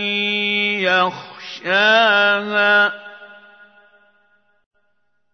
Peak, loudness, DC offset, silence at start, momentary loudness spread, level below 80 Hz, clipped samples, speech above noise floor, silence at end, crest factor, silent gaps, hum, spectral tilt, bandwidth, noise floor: -2 dBFS; -15 LUFS; under 0.1%; 0 s; 20 LU; -78 dBFS; under 0.1%; 55 dB; 2 s; 18 dB; none; none; -3.5 dB/octave; 6.6 kHz; -71 dBFS